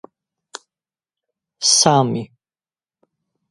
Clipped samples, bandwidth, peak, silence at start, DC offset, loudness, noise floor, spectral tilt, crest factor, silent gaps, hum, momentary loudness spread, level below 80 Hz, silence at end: under 0.1%; 11.5 kHz; 0 dBFS; 1.6 s; under 0.1%; -15 LUFS; under -90 dBFS; -3 dB/octave; 22 dB; none; none; 26 LU; -64 dBFS; 1.25 s